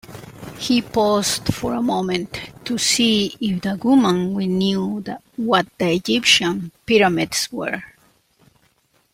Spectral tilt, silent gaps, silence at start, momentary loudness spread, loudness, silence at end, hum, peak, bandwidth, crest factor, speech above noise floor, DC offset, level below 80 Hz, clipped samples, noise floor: -3.5 dB/octave; none; 0.1 s; 13 LU; -19 LUFS; 1.25 s; none; -2 dBFS; 16.5 kHz; 18 dB; 42 dB; under 0.1%; -52 dBFS; under 0.1%; -61 dBFS